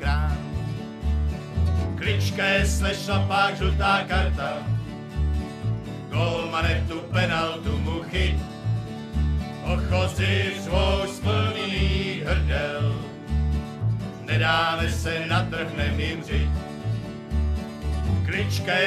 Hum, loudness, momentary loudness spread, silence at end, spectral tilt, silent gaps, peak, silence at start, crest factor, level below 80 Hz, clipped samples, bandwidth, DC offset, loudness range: none; -25 LUFS; 8 LU; 0 s; -5.5 dB/octave; none; -8 dBFS; 0 s; 16 dB; -30 dBFS; under 0.1%; 13.5 kHz; under 0.1%; 3 LU